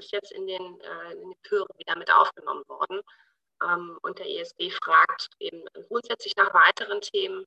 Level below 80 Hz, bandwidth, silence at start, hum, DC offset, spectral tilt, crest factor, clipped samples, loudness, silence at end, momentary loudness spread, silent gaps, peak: -84 dBFS; 8.8 kHz; 0 s; none; under 0.1%; -2 dB/octave; 22 dB; under 0.1%; -25 LUFS; 0.05 s; 18 LU; none; -4 dBFS